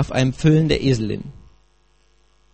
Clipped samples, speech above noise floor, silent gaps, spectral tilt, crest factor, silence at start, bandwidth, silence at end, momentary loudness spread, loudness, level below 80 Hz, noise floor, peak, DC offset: under 0.1%; 42 dB; none; -6.5 dB/octave; 18 dB; 0 s; 8.8 kHz; 1.2 s; 14 LU; -19 LUFS; -40 dBFS; -60 dBFS; -2 dBFS; 0.3%